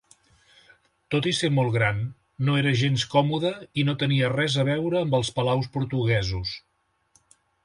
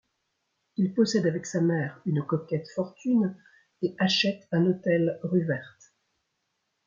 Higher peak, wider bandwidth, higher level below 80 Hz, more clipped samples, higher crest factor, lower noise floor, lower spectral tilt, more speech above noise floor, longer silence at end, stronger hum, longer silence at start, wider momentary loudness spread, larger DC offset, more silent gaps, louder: about the same, -8 dBFS vs -10 dBFS; first, 11.5 kHz vs 7.6 kHz; first, -50 dBFS vs -72 dBFS; neither; about the same, 18 dB vs 16 dB; second, -66 dBFS vs -79 dBFS; about the same, -5.5 dB/octave vs -6 dB/octave; second, 42 dB vs 52 dB; second, 1.05 s vs 1.2 s; neither; first, 1.1 s vs 0.8 s; about the same, 7 LU vs 8 LU; neither; neither; first, -24 LUFS vs -27 LUFS